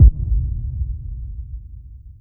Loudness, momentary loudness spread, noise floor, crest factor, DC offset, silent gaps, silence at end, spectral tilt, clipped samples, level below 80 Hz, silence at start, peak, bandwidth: -24 LUFS; 18 LU; -38 dBFS; 18 dB; under 0.1%; none; 0.1 s; -16 dB/octave; under 0.1%; -20 dBFS; 0 s; 0 dBFS; 0.6 kHz